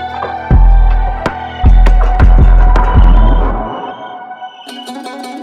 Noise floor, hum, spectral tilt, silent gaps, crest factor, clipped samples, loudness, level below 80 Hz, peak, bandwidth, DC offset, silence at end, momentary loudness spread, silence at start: -28 dBFS; none; -7.5 dB/octave; none; 8 dB; under 0.1%; -11 LUFS; -10 dBFS; 0 dBFS; 4.9 kHz; under 0.1%; 0 s; 18 LU; 0 s